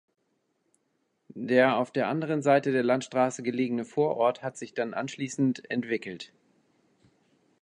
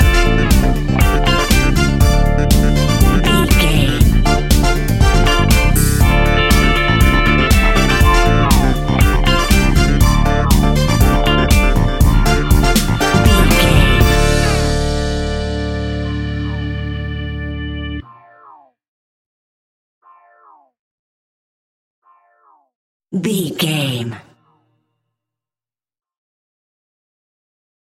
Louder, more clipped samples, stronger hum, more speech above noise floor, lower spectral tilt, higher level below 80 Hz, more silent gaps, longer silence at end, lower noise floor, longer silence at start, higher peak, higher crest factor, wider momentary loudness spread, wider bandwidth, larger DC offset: second, -27 LUFS vs -14 LUFS; neither; neither; second, 48 dB vs over 71 dB; about the same, -5.5 dB/octave vs -5 dB/octave; second, -78 dBFS vs -16 dBFS; second, none vs 18.88-20.01 s, 20.79-22.02 s, 22.75-23.00 s; second, 1.35 s vs 3.8 s; second, -75 dBFS vs under -90 dBFS; first, 1.35 s vs 0 s; second, -8 dBFS vs 0 dBFS; first, 20 dB vs 14 dB; first, 13 LU vs 10 LU; second, 10.5 kHz vs 17 kHz; neither